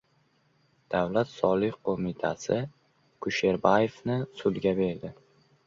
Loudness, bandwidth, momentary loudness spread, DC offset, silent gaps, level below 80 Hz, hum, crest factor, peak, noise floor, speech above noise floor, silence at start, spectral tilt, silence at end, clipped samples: -28 LUFS; 7.6 kHz; 8 LU; under 0.1%; none; -60 dBFS; none; 22 dB; -6 dBFS; -68 dBFS; 41 dB; 0.9 s; -6.5 dB/octave; 0.55 s; under 0.1%